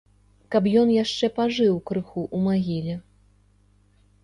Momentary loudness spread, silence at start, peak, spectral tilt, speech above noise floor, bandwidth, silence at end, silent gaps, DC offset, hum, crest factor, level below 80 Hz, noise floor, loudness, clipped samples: 10 LU; 0.5 s; -8 dBFS; -6.5 dB/octave; 37 dB; 10.5 kHz; 1.25 s; none; under 0.1%; 50 Hz at -50 dBFS; 16 dB; -58 dBFS; -59 dBFS; -23 LUFS; under 0.1%